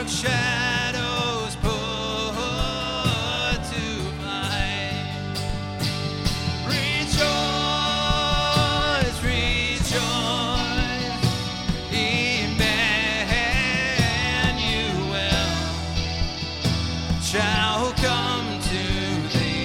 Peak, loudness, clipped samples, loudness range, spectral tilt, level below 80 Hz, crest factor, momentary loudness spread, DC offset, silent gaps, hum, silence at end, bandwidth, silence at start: -6 dBFS; -23 LUFS; under 0.1%; 4 LU; -4 dB/octave; -34 dBFS; 18 dB; 6 LU; under 0.1%; none; none; 0 s; 16.5 kHz; 0 s